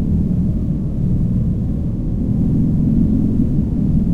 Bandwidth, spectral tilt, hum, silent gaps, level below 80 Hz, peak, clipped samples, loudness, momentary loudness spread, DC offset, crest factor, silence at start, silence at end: 3.7 kHz; -12 dB/octave; none; none; -22 dBFS; -4 dBFS; under 0.1%; -18 LUFS; 5 LU; under 0.1%; 12 dB; 0 s; 0 s